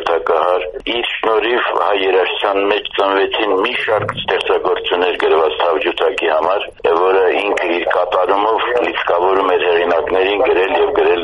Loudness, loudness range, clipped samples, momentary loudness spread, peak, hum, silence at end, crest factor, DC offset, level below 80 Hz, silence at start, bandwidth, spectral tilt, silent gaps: -15 LUFS; 1 LU; under 0.1%; 3 LU; 0 dBFS; none; 0 s; 14 dB; under 0.1%; -48 dBFS; 0 s; 10.5 kHz; -5 dB/octave; none